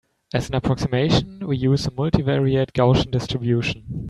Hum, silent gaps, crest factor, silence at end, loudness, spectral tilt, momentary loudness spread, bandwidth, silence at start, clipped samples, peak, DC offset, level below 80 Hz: none; none; 20 dB; 0 s; -21 LUFS; -7 dB/octave; 7 LU; 11 kHz; 0.35 s; under 0.1%; -2 dBFS; under 0.1%; -40 dBFS